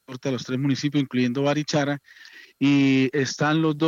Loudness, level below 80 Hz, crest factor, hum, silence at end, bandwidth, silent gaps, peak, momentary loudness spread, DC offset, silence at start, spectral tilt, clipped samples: -23 LUFS; -72 dBFS; 14 dB; none; 0 s; 7.6 kHz; none; -10 dBFS; 9 LU; under 0.1%; 0.1 s; -6 dB/octave; under 0.1%